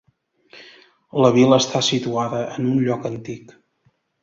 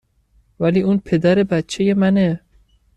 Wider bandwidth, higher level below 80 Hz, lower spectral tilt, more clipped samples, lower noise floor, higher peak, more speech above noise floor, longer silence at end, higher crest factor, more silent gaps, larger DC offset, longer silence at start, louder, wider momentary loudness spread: second, 7.8 kHz vs 9.8 kHz; second, -60 dBFS vs -50 dBFS; second, -5 dB/octave vs -7 dB/octave; neither; first, -64 dBFS vs -58 dBFS; about the same, -2 dBFS vs -4 dBFS; about the same, 45 dB vs 42 dB; first, 0.85 s vs 0.6 s; about the same, 18 dB vs 14 dB; neither; neither; about the same, 0.55 s vs 0.6 s; about the same, -19 LUFS vs -17 LUFS; first, 16 LU vs 5 LU